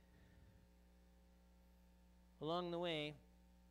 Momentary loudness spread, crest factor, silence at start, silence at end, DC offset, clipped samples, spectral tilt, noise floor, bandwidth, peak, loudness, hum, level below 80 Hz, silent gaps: 8 LU; 20 dB; 0.1 s; 0 s; under 0.1%; under 0.1%; -6 dB/octave; -69 dBFS; 15.5 kHz; -30 dBFS; -45 LUFS; 60 Hz at -70 dBFS; -70 dBFS; none